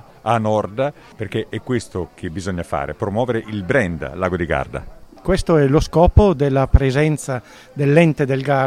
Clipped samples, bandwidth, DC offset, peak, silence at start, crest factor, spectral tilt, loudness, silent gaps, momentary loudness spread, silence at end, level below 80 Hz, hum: 0.1%; 14 kHz; under 0.1%; 0 dBFS; 0.25 s; 18 dB; -7 dB/octave; -19 LUFS; none; 13 LU; 0 s; -28 dBFS; none